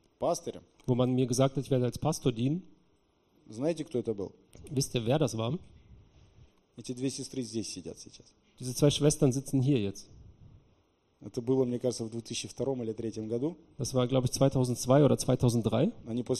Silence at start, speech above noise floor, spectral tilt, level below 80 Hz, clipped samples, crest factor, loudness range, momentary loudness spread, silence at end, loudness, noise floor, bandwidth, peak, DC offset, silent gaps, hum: 0.2 s; 39 dB; -6 dB/octave; -56 dBFS; under 0.1%; 20 dB; 6 LU; 15 LU; 0 s; -30 LUFS; -69 dBFS; 13 kHz; -10 dBFS; under 0.1%; none; none